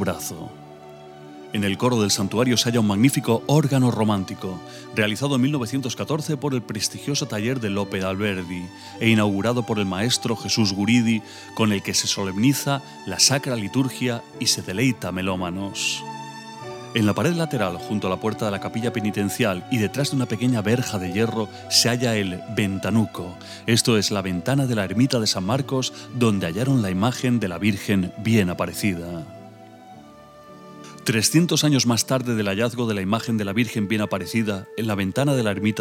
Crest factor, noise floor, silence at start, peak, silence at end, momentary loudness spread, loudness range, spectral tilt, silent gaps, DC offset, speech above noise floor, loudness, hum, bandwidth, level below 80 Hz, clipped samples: 20 dB; -45 dBFS; 0 s; -2 dBFS; 0 s; 12 LU; 4 LU; -4.5 dB/octave; none; under 0.1%; 23 dB; -22 LUFS; none; 17 kHz; -60 dBFS; under 0.1%